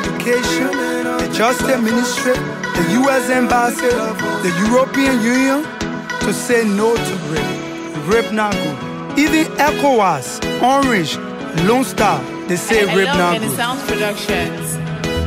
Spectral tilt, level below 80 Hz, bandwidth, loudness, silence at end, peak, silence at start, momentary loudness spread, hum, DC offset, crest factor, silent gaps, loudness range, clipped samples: -4.5 dB/octave; -40 dBFS; 16 kHz; -16 LUFS; 0 s; -4 dBFS; 0 s; 8 LU; none; under 0.1%; 12 dB; none; 2 LU; under 0.1%